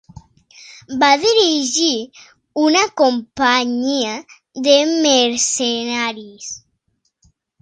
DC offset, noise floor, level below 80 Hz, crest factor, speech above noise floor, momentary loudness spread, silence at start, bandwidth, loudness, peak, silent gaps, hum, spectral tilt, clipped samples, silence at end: under 0.1%; -68 dBFS; -58 dBFS; 18 dB; 52 dB; 17 LU; 0.65 s; 10 kHz; -15 LUFS; 0 dBFS; none; none; -1 dB/octave; under 0.1%; 1.05 s